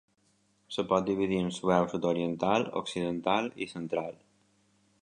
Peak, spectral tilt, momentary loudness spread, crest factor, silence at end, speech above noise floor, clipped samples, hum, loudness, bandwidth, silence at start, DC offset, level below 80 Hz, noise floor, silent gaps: -10 dBFS; -6 dB/octave; 8 LU; 22 dB; 0.9 s; 40 dB; under 0.1%; none; -30 LUFS; 10.5 kHz; 0.7 s; under 0.1%; -64 dBFS; -70 dBFS; none